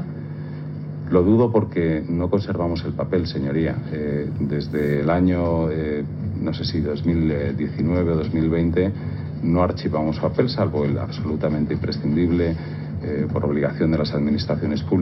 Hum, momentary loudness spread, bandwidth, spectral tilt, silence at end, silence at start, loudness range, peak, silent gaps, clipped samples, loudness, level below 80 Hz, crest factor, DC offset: none; 7 LU; 6 kHz; -9.5 dB/octave; 0 s; 0 s; 1 LU; -4 dBFS; none; under 0.1%; -22 LUFS; -40 dBFS; 18 dB; under 0.1%